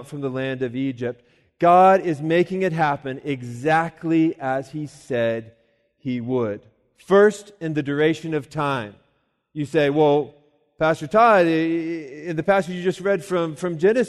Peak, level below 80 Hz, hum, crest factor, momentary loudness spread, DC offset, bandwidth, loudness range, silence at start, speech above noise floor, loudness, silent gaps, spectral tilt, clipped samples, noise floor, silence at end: -4 dBFS; -62 dBFS; none; 18 dB; 14 LU; under 0.1%; 12.5 kHz; 4 LU; 0 s; 47 dB; -21 LUFS; none; -6.5 dB/octave; under 0.1%; -68 dBFS; 0 s